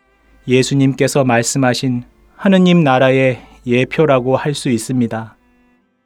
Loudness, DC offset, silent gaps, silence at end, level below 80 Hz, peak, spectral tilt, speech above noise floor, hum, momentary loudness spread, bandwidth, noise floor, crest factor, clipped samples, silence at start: -14 LUFS; under 0.1%; none; 0.8 s; -50 dBFS; 0 dBFS; -5.5 dB/octave; 42 dB; none; 10 LU; 14.5 kHz; -56 dBFS; 14 dB; under 0.1%; 0.45 s